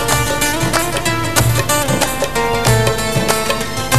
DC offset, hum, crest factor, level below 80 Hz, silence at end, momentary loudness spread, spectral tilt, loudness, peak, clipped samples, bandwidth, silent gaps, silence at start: 4%; none; 16 dB; -30 dBFS; 0 s; 3 LU; -3.5 dB/octave; -15 LUFS; 0 dBFS; under 0.1%; 14 kHz; none; 0 s